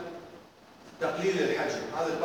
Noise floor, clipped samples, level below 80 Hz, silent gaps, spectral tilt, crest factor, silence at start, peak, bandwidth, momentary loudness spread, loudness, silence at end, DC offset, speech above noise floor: -53 dBFS; under 0.1%; -70 dBFS; none; -4.5 dB/octave; 16 dB; 0 s; -16 dBFS; 18.5 kHz; 20 LU; -30 LUFS; 0 s; under 0.1%; 24 dB